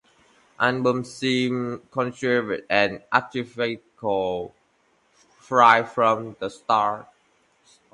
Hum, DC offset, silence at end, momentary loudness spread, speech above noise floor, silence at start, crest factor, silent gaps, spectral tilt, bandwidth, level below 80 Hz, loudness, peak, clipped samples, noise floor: none; under 0.1%; 0.9 s; 14 LU; 42 dB; 0.6 s; 22 dB; none; -5 dB/octave; 11.5 kHz; -64 dBFS; -23 LUFS; -2 dBFS; under 0.1%; -65 dBFS